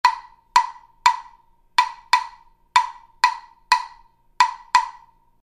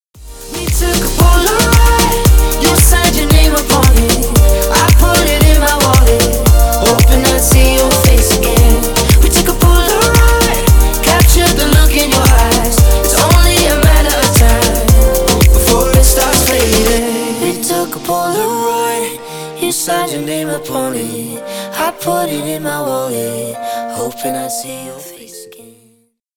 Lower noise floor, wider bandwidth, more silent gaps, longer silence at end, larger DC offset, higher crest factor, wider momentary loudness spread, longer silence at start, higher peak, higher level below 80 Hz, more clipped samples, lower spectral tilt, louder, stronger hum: about the same, -54 dBFS vs -54 dBFS; second, 14.5 kHz vs over 20 kHz; neither; second, 0.5 s vs 0.9 s; neither; first, 22 dB vs 10 dB; about the same, 13 LU vs 11 LU; second, 0.05 s vs 0.2 s; about the same, -2 dBFS vs 0 dBFS; second, -58 dBFS vs -12 dBFS; neither; second, 2 dB/octave vs -4 dB/octave; second, -21 LUFS vs -11 LUFS; neither